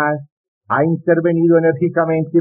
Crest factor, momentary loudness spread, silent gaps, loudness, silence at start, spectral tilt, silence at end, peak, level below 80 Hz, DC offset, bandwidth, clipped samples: 12 dB; 7 LU; 0.32-0.61 s; -16 LUFS; 0 s; -9 dB/octave; 0 s; -4 dBFS; -62 dBFS; under 0.1%; 3.3 kHz; under 0.1%